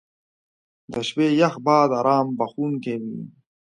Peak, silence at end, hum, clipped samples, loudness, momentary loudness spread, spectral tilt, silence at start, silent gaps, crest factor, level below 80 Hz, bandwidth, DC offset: -4 dBFS; 0.45 s; none; under 0.1%; -21 LUFS; 15 LU; -6.5 dB/octave; 0.9 s; none; 18 dB; -68 dBFS; 10 kHz; under 0.1%